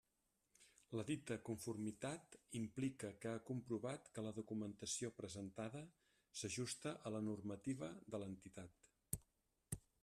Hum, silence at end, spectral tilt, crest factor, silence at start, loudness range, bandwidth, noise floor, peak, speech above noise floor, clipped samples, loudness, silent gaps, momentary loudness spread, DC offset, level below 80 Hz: none; 0.25 s; -5 dB/octave; 24 dB; 0.6 s; 1 LU; 13.5 kHz; -87 dBFS; -26 dBFS; 38 dB; under 0.1%; -49 LUFS; none; 8 LU; under 0.1%; -76 dBFS